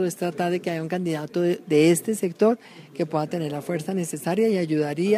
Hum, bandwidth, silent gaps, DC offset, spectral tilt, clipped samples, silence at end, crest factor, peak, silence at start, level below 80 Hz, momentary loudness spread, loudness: none; 15.5 kHz; none; under 0.1%; -6 dB/octave; under 0.1%; 0 s; 16 dB; -8 dBFS; 0 s; -72 dBFS; 9 LU; -24 LUFS